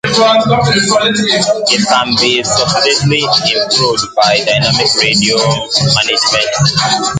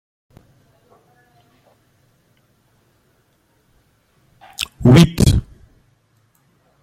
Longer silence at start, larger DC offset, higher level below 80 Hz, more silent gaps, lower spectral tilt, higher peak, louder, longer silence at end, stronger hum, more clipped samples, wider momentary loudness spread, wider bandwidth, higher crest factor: second, 0.05 s vs 4.6 s; neither; second, -42 dBFS vs -34 dBFS; neither; second, -3 dB/octave vs -6.5 dB/octave; about the same, 0 dBFS vs 0 dBFS; first, -10 LUFS vs -14 LUFS; second, 0 s vs 1.4 s; neither; neither; second, 2 LU vs 16 LU; second, 9.6 kHz vs 16.5 kHz; second, 12 dB vs 20 dB